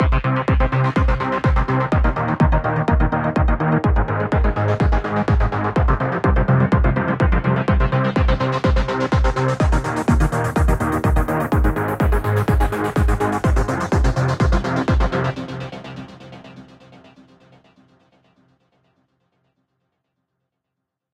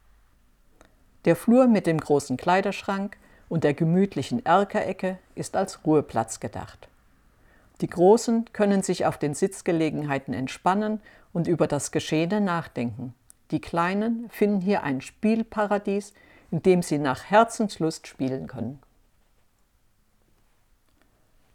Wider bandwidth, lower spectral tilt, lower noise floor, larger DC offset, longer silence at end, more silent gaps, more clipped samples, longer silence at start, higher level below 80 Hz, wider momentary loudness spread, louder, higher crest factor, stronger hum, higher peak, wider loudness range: about the same, 15 kHz vs 15.5 kHz; first, -7.5 dB/octave vs -6 dB/octave; first, -80 dBFS vs -64 dBFS; neither; first, 4.5 s vs 2.8 s; neither; neither; second, 0 s vs 1.25 s; first, -22 dBFS vs -58 dBFS; second, 3 LU vs 12 LU; first, -19 LUFS vs -25 LUFS; second, 14 dB vs 20 dB; neither; about the same, -4 dBFS vs -6 dBFS; about the same, 5 LU vs 4 LU